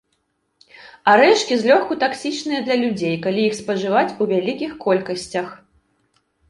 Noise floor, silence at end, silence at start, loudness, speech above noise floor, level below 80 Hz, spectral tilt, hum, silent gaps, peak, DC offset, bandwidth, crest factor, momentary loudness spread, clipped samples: -69 dBFS; 0.95 s; 0.8 s; -19 LUFS; 51 dB; -62 dBFS; -4.5 dB/octave; none; none; 0 dBFS; under 0.1%; 11.5 kHz; 20 dB; 11 LU; under 0.1%